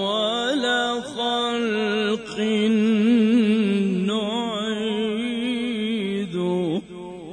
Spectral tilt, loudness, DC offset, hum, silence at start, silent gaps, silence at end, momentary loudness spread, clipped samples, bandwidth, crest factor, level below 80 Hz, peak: -5.5 dB/octave; -22 LUFS; under 0.1%; none; 0 s; none; 0 s; 7 LU; under 0.1%; 10 kHz; 14 dB; -62 dBFS; -8 dBFS